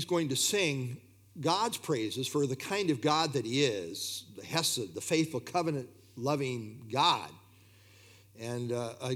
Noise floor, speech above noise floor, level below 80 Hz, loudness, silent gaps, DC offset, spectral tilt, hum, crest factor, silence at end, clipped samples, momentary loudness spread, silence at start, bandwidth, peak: -59 dBFS; 27 dB; -78 dBFS; -32 LUFS; none; under 0.1%; -4 dB/octave; none; 22 dB; 0 s; under 0.1%; 12 LU; 0 s; 18.5 kHz; -12 dBFS